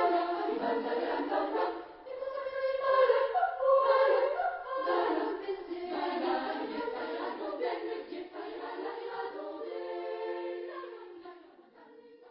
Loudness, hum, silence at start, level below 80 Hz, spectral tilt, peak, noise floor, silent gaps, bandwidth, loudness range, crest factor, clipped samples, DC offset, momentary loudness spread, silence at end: -32 LUFS; none; 0 s; -74 dBFS; -0.5 dB/octave; -14 dBFS; -56 dBFS; none; 5.6 kHz; 11 LU; 18 dB; under 0.1%; under 0.1%; 15 LU; 0 s